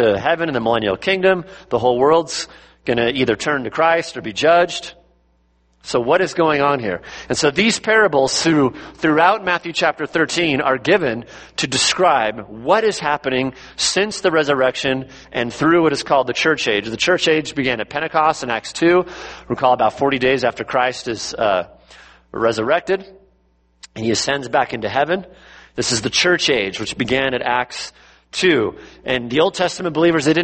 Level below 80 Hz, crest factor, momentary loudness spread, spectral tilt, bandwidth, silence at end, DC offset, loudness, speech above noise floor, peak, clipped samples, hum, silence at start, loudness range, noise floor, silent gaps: -50 dBFS; 18 dB; 10 LU; -3.5 dB/octave; 8.8 kHz; 0 s; under 0.1%; -17 LUFS; 41 dB; 0 dBFS; under 0.1%; none; 0 s; 4 LU; -59 dBFS; none